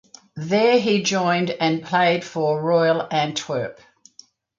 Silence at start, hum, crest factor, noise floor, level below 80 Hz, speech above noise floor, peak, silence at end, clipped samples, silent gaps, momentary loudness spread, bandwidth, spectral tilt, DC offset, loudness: 0.35 s; none; 16 dB; -51 dBFS; -66 dBFS; 31 dB; -6 dBFS; 0.85 s; under 0.1%; none; 10 LU; 7.6 kHz; -4.5 dB/octave; under 0.1%; -20 LUFS